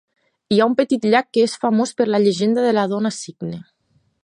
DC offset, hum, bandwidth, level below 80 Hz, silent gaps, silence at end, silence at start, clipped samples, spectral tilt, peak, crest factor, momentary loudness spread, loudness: under 0.1%; none; 11 kHz; -64 dBFS; none; 0.6 s; 0.5 s; under 0.1%; -5.5 dB/octave; -2 dBFS; 16 dB; 13 LU; -18 LUFS